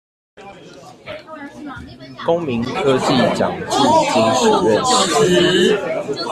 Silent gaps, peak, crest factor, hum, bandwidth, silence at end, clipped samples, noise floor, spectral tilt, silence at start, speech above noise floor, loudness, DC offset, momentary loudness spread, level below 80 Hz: none; -2 dBFS; 14 dB; none; 14 kHz; 0 s; under 0.1%; -38 dBFS; -4 dB/octave; 0.4 s; 21 dB; -15 LUFS; under 0.1%; 20 LU; -50 dBFS